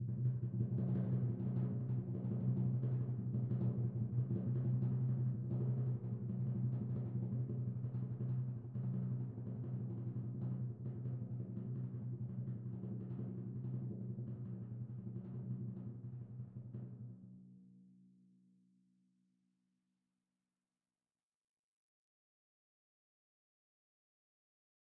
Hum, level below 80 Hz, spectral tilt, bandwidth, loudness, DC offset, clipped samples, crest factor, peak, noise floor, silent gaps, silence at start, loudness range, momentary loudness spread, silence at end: none; -70 dBFS; -13.5 dB/octave; 1.9 kHz; -42 LUFS; under 0.1%; under 0.1%; 16 dB; -26 dBFS; under -90 dBFS; none; 0 s; 11 LU; 11 LU; 7 s